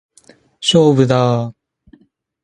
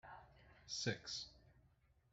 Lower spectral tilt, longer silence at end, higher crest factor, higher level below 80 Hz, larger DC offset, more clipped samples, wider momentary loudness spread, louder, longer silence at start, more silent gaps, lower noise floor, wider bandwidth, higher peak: first, -6 dB/octave vs -3 dB/octave; first, 0.9 s vs 0.45 s; second, 16 dB vs 26 dB; first, -54 dBFS vs -74 dBFS; neither; neither; second, 10 LU vs 21 LU; first, -14 LUFS vs -46 LUFS; first, 0.6 s vs 0.05 s; neither; second, -51 dBFS vs -75 dBFS; first, 11 kHz vs 8.2 kHz; first, 0 dBFS vs -26 dBFS